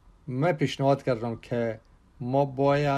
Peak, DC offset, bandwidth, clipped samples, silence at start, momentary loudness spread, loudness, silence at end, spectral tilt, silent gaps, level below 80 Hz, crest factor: -10 dBFS; under 0.1%; 10 kHz; under 0.1%; 0.25 s; 11 LU; -27 LUFS; 0 s; -7.5 dB/octave; none; -56 dBFS; 16 dB